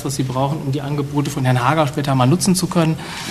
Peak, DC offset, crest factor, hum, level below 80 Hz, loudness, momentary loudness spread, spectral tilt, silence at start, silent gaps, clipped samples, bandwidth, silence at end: 0 dBFS; under 0.1%; 18 dB; none; -46 dBFS; -18 LUFS; 7 LU; -5.5 dB/octave; 0 s; none; under 0.1%; 13.5 kHz; 0 s